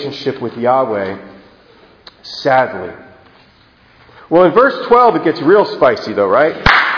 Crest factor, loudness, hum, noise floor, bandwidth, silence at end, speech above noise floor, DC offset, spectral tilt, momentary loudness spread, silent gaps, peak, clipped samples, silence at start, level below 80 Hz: 14 dB; -12 LUFS; none; -48 dBFS; 5.4 kHz; 0 s; 35 dB; under 0.1%; -6.5 dB/octave; 12 LU; none; 0 dBFS; 0.2%; 0 s; -40 dBFS